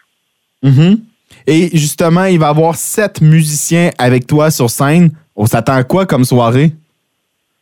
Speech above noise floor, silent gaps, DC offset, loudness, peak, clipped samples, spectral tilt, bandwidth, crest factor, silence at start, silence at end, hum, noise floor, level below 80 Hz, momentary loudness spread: 56 dB; none; under 0.1%; -11 LUFS; 0 dBFS; under 0.1%; -6 dB/octave; 18 kHz; 10 dB; 0.65 s; 0.85 s; none; -66 dBFS; -48 dBFS; 5 LU